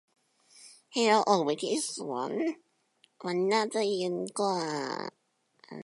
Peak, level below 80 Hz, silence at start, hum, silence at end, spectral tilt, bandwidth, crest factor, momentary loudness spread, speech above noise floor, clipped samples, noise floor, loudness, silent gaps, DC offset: -10 dBFS; -84 dBFS; 0.55 s; none; 0 s; -3.5 dB/octave; 11.5 kHz; 22 dB; 13 LU; 40 dB; under 0.1%; -69 dBFS; -30 LUFS; none; under 0.1%